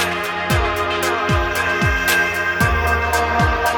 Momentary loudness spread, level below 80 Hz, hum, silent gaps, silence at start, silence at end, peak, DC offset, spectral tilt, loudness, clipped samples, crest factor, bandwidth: 3 LU; -28 dBFS; none; none; 0 s; 0 s; -2 dBFS; under 0.1%; -4 dB/octave; -17 LUFS; under 0.1%; 16 dB; 19 kHz